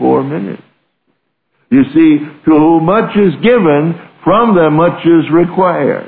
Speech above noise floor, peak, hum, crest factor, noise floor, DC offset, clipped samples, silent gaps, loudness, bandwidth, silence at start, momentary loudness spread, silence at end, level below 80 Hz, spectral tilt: 54 dB; 0 dBFS; none; 10 dB; -64 dBFS; under 0.1%; under 0.1%; none; -10 LUFS; 4.2 kHz; 0 s; 10 LU; 0 s; -44 dBFS; -11.5 dB/octave